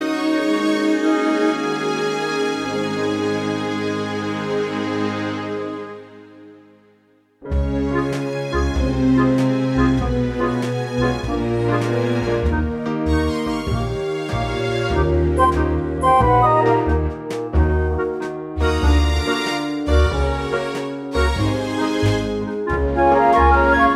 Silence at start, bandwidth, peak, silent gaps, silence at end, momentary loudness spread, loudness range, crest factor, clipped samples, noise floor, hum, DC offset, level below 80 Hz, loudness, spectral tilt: 0 s; 12.5 kHz; -2 dBFS; none; 0 s; 9 LU; 7 LU; 16 dB; under 0.1%; -57 dBFS; none; under 0.1%; -26 dBFS; -19 LUFS; -6.5 dB/octave